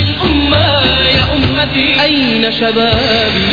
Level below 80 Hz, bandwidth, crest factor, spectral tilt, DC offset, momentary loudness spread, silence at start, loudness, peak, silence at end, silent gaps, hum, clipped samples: -26 dBFS; 5.2 kHz; 12 dB; -6.5 dB/octave; 0.9%; 3 LU; 0 s; -10 LUFS; 0 dBFS; 0 s; none; none; under 0.1%